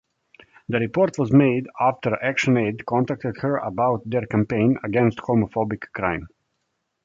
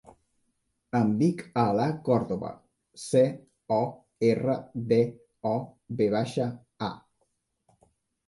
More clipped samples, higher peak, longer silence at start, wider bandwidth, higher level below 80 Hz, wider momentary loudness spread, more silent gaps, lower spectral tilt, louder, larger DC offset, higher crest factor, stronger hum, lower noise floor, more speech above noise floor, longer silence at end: neither; first, -4 dBFS vs -10 dBFS; second, 0.7 s vs 0.95 s; second, 7.6 kHz vs 11.5 kHz; first, -52 dBFS vs -64 dBFS; second, 8 LU vs 11 LU; neither; about the same, -7.5 dB/octave vs -7.5 dB/octave; first, -22 LUFS vs -28 LUFS; neither; about the same, 18 dB vs 18 dB; neither; about the same, -75 dBFS vs -76 dBFS; first, 54 dB vs 49 dB; second, 0.8 s vs 1.3 s